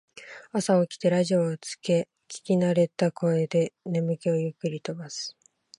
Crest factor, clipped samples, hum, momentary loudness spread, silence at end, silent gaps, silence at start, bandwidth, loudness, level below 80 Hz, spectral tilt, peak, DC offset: 16 dB; under 0.1%; none; 12 LU; 0.5 s; none; 0.15 s; 11.5 kHz; -26 LUFS; -74 dBFS; -6 dB/octave; -10 dBFS; under 0.1%